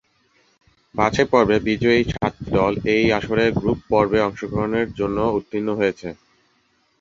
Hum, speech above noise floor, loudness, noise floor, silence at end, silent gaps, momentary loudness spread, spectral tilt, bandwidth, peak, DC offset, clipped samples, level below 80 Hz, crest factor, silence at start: none; 44 dB; -20 LUFS; -64 dBFS; 0.85 s; none; 8 LU; -6.5 dB/octave; 7.6 kHz; -2 dBFS; under 0.1%; under 0.1%; -42 dBFS; 20 dB; 0.95 s